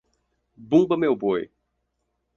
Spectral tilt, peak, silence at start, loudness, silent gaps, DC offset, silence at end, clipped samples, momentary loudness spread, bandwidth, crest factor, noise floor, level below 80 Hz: -8 dB/octave; -6 dBFS; 0.6 s; -22 LUFS; none; under 0.1%; 0.9 s; under 0.1%; 9 LU; 7 kHz; 20 dB; -76 dBFS; -64 dBFS